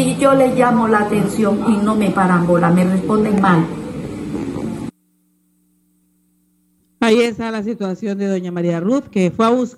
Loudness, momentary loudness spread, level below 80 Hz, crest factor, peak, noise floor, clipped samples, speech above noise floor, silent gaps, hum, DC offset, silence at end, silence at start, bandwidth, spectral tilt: -16 LUFS; 12 LU; -48 dBFS; 14 dB; -2 dBFS; -61 dBFS; under 0.1%; 46 dB; none; none; under 0.1%; 0.05 s; 0 s; 12.5 kHz; -6.5 dB/octave